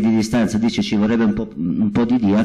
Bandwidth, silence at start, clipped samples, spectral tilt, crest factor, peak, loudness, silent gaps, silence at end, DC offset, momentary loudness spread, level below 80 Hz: 11.5 kHz; 0 s; under 0.1%; -6.5 dB/octave; 8 dB; -10 dBFS; -18 LUFS; none; 0 s; under 0.1%; 4 LU; -44 dBFS